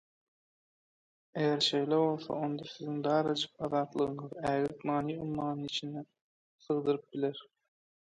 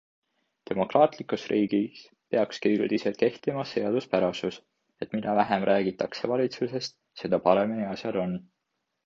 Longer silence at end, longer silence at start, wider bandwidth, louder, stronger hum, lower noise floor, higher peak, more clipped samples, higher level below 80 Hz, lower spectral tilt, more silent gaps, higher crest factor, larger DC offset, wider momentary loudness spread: about the same, 0.75 s vs 0.65 s; first, 1.35 s vs 0.7 s; first, 10.5 kHz vs 7.6 kHz; second, -33 LUFS vs -27 LUFS; neither; first, under -90 dBFS vs -81 dBFS; second, -16 dBFS vs -6 dBFS; neither; about the same, -70 dBFS vs -66 dBFS; about the same, -5.5 dB/octave vs -6.5 dB/octave; first, 6.21-6.58 s vs none; about the same, 18 dB vs 22 dB; neither; second, 8 LU vs 11 LU